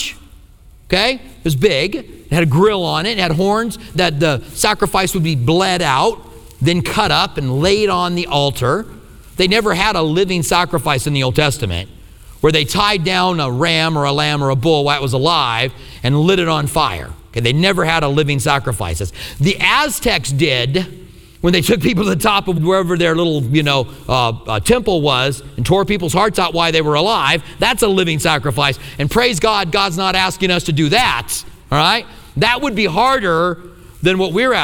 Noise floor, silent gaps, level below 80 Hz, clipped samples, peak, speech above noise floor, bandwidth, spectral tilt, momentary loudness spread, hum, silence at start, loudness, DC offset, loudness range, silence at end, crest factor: -42 dBFS; none; -36 dBFS; under 0.1%; 0 dBFS; 27 dB; 19.5 kHz; -4.5 dB/octave; 6 LU; none; 0 s; -15 LUFS; under 0.1%; 1 LU; 0 s; 16 dB